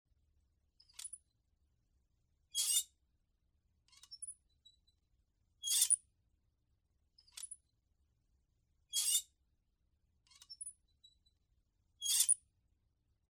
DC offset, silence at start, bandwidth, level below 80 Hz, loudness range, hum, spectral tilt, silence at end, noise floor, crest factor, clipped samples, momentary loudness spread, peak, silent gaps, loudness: under 0.1%; 1 s; 17 kHz; -80 dBFS; 3 LU; none; 5 dB/octave; 0.95 s; -80 dBFS; 26 dB; under 0.1%; 25 LU; -18 dBFS; none; -34 LUFS